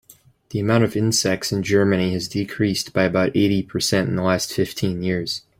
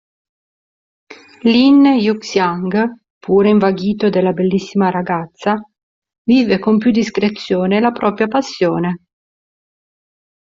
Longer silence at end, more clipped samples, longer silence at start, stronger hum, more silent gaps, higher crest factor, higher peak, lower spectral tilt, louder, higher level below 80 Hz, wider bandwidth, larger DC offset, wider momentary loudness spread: second, 0.2 s vs 1.45 s; neither; second, 0.5 s vs 1.1 s; neither; second, none vs 3.10-3.21 s, 5.83-6.02 s, 6.18-6.25 s; about the same, 18 dB vs 14 dB; about the same, -4 dBFS vs -2 dBFS; second, -5 dB/octave vs -6.5 dB/octave; second, -20 LUFS vs -15 LUFS; about the same, -52 dBFS vs -56 dBFS; first, 16.5 kHz vs 7.6 kHz; neither; second, 5 LU vs 9 LU